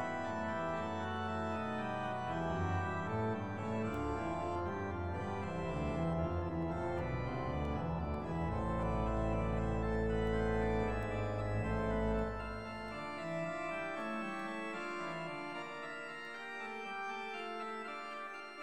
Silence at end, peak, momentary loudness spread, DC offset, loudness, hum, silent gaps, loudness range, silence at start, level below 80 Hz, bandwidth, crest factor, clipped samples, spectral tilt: 0 s; -22 dBFS; 8 LU; 0.2%; -39 LUFS; none; none; 6 LU; 0 s; -48 dBFS; 10 kHz; 16 dB; under 0.1%; -7.5 dB/octave